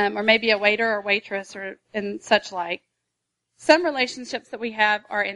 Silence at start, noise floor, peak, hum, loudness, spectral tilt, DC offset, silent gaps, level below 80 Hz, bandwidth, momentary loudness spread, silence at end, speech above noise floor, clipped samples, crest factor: 0 s; -80 dBFS; -2 dBFS; none; -22 LUFS; -3 dB/octave; under 0.1%; none; -70 dBFS; 11.5 kHz; 14 LU; 0 s; 57 dB; under 0.1%; 22 dB